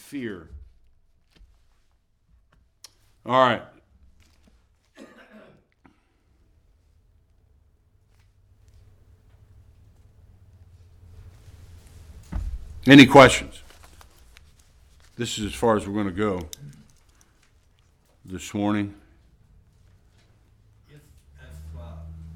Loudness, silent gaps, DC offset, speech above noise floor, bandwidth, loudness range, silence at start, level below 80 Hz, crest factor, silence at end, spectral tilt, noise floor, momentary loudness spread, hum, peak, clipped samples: -19 LUFS; none; under 0.1%; 46 dB; 15.5 kHz; 16 LU; 0.15 s; -46 dBFS; 26 dB; 0.05 s; -5 dB/octave; -64 dBFS; 30 LU; none; 0 dBFS; under 0.1%